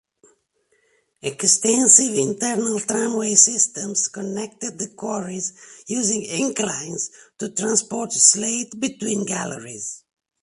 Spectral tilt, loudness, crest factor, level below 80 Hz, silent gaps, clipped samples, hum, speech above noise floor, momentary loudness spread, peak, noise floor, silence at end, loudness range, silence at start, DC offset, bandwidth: -2 dB/octave; -19 LUFS; 22 dB; -68 dBFS; none; under 0.1%; none; 45 dB; 17 LU; 0 dBFS; -66 dBFS; 0.45 s; 8 LU; 1.25 s; under 0.1%; 11.5 kHz